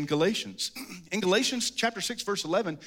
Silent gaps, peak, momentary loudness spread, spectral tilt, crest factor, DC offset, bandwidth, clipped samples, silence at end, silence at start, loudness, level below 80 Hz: none; -12 dBFS; 9 LU; -3 dB/octave; 18 dB; under 0.1%; 17 kHz; under 0.1%; 0 s; 0 s; -28 LUFS; -70 dBFS